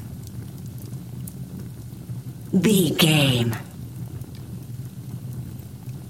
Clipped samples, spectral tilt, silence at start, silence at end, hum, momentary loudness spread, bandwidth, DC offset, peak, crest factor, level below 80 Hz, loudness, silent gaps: under 0.1%; -5 dB/octave; 0 s; 0 s; none; 19 LU; 17 kHz; 0.1%; -4 dBFS; 22 dB; -50 dBFS; -23 LUFS; none